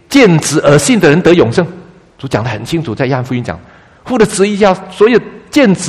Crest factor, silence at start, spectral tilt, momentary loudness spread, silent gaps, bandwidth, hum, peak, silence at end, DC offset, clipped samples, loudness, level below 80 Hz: 10 dB; 0.1 s; -5.5 dB/octave; 11 LU; none; 15 kHz; none; 0 dBFS; 0 s; under 0.1%; 0.6%; -11 LUFS; -40 dBFS